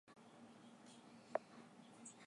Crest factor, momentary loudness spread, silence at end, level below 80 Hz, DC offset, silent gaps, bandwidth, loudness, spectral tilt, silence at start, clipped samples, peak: 30 dB; 14 LU; 0 s; under -90 dBFS; under 0.1%; none; 11 kHz; -55 LUFS; -4 dB/octave; 0.05 s; under 0.1%; -26 dBFS